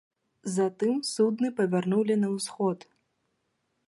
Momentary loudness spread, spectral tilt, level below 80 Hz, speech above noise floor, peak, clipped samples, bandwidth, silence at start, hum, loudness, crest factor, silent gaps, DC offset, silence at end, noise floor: 6 LU; -5.5 dB/octave; -78 dBFS; 50 dB; -14 dBFS; under 0.1%; 12 kHz; 0.45 s; none; -27 LUFS; 16 dB; none; under 0.1%; 1.1 s; -77 dBFS